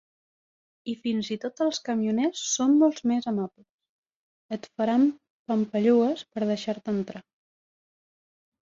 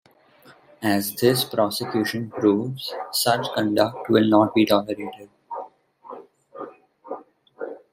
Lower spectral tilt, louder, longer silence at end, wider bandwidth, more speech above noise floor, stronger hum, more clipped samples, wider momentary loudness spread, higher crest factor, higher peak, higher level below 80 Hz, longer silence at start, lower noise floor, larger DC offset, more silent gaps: about the same, -4.5 dB/octave vs -5 dB/octave; second, -26 LUFS vs -22 LUFS; first, 1.45 s vs 0.15 s; second, 7.8 kHz vs 16 kHz; first, over 65 dB vs 31 dB; neither; neither; second, 15 LU vs 21 LU; about the same, 18 dB vs 20 dB; second, -10 dBFS vs -4 dBFS; second, -72 dBFS vs -66 dBFS; first, 0.85 s vs 0.5 s; first, under -90 dBFS vs -53 dBFS; neither; first, 3.69-3.79 s, 3.89-4.03 s, 4.15-4.49 s, 5.30-5.45 s vs none